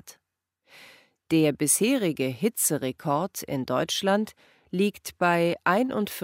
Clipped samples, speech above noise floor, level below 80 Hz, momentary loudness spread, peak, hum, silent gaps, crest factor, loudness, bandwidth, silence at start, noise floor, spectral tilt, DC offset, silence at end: under 0.1%; 54 dB; -68 dBFS; 7 LU; -6 dBFS; none; none; 20 dB; -25 LUFS; 16 kHz; 0.05 s; -80 dBFS; -4 dB/octave; under 0.1%; 0 s